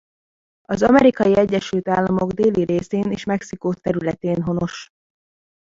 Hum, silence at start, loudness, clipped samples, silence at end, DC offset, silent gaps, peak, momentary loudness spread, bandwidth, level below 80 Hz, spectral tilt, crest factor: none; 0.7 s; -19 LUFS; under 0.1%; 0.85 s; under 0.1%; none; -2 dBFS; 11 LU; 7.8 kHz; -50 dBFS; -7 dB/octave; 18 dB